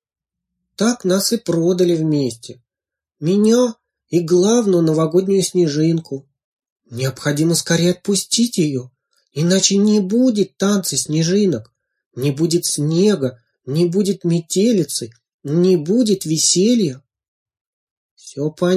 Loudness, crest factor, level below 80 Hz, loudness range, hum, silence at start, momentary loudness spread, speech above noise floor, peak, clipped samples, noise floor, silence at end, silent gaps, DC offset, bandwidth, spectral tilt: -17 LUFS; 16 dB; -62 dBFS; 2 LU; none; 0.8 s; 11 LU; 71 dB; -2 dBFS; under 0.1%; -88 dBFS; 0 s; 6.44-6.57 s, 6.72-6.76 s, 12.06-12.11 s, 15.34-15.39 s, 17.28-17.46 s, 17.61-18.17 s; under 0.1%; 15.5 kHz; -5 dB/octave